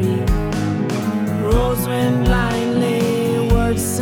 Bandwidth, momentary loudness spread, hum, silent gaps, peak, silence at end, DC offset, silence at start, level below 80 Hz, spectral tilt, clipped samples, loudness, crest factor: 18 kHz; 3 LU; none; none; -4 dBFS; 0 s; under 0.1%; 0 s; -24 dBFS; -6 dB/octave; under 0.1%; -18 LUFS; 14 dB